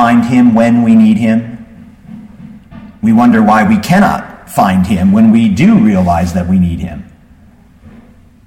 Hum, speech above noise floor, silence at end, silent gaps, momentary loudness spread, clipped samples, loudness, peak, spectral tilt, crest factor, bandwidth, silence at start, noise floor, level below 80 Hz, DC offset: none; 33 dB; 1.45 s; none; 12 LU; under 0.1%; -9 LUFS; 0 dBFS; -7.5 dB/octave; 10 dB; 15 kHz; 0 s; -41 dBFS; -36 dBFS; under 0.1%